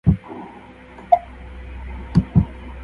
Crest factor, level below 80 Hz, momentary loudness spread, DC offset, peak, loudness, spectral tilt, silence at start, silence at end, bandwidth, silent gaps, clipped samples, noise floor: 22 dB; -32 dBFS; 22 LU; under 0.1%; 0 dBFS; -21 LUFS; -10.5 dB/octave; 0.05 s; 0 s; 5.4 kHz; none; under 0.1%; -41 dBFS